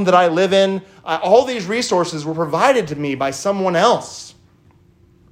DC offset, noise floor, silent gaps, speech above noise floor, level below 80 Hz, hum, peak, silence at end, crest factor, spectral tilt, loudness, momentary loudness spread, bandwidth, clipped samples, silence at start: under 0.1%; -52 dBFS; none; 35 dB; -60 dBFS; none; 0 dBFS; 1 s; 16 dB; -4.5 dB/octave; -17 LUFS; 9 LU; 15.5 kHz; under 0.1%; 0 s